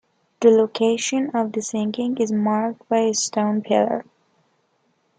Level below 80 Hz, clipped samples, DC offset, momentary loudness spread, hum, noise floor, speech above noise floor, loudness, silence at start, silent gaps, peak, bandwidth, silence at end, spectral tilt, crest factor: -70 dBFS; under 0.1%; under 0.1%; 7 LU; none; -66 dBFS; 46 dB; -21 LUFS; 0.4 s; none; -4 dBFS; 9.6 kHz; 1.15 s; -4.5 dB/octave; 18 dB